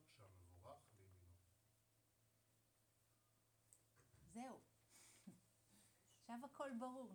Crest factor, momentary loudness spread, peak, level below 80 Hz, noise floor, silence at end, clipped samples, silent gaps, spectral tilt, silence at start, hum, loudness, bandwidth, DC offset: 22 dB; 17 LU; -38 dBFS; -88 dBFS; -82 dBFS; 0 s; under 0.1%; none; -5 dB/octave; 0 s; none; -57 LUFS; over 20 kHz; under 0.1%